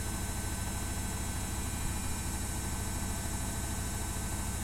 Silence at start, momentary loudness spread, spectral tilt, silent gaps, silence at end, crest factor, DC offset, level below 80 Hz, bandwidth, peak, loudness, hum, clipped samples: 0 s; 0 LU; -3.5 dB/octave; none; 0 s; 12 dB; under 0.1%; -40 dBFS; 16.5 kHz; -22 dBFS; -36 LUFS; none; under 0.1%